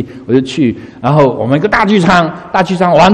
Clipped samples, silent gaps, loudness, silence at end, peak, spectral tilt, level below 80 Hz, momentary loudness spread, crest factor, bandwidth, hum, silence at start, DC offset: 0.6%; none; -11 LUFS; 0 s; 0 dBFS; -6.5 dB/octave; -38 dBFS; 6 LU; 10 dB; 10 kHz; none; 0 s; under 0.1%